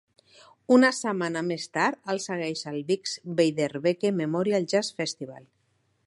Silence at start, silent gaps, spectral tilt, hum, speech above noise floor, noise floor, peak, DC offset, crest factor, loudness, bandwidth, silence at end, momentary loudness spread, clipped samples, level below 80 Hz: 0.7 s; none; -4.5 dB/octave; none; 45 dB; -71 dBFS; -6 dBFS; under 0.1%; 20 dB; -26 LUFS; 11.5 kHz; 0.65 s; 11 LU; under 0.1%; -76 dBFS